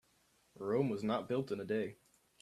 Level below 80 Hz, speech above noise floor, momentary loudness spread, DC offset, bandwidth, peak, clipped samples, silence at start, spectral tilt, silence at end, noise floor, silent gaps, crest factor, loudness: -76 dBFS; 36 dB; 7 LU; under 0.1%; 13.5 kHz; -20 dBFS; under 0.1%; 0.55 s; -7.5 dB/octave; 0.45 s; -73 dBFS; none; 18 dB; -38 LUFS